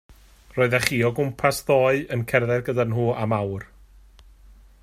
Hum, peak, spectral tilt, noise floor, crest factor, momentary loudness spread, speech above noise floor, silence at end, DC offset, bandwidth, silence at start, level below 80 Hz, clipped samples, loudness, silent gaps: none; -2 dBFS; -5.5 dB/octave; -50 dBFS; 22 dB; 6 LU; 28 dB; 1.2 s; under 0.1%; 16 kHz; 0.55 s; -50 dBFS; under 0.1%; -22 LUFS; none